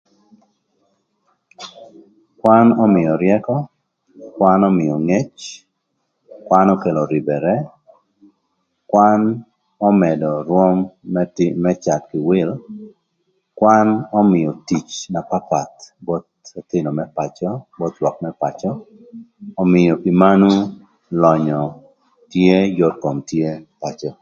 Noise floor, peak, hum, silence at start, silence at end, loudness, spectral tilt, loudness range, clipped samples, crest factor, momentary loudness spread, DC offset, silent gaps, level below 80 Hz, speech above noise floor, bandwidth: -71 dBFS; 0 dBFS; none; 1.6 s; 0.1 s; -17 LUFS; -7.5 dB/octave; 7 LU; under 0.1%; 18 dB; 17 LU; under 0.1%; none; -54 dBFS; 55 dB; 7.6 kHz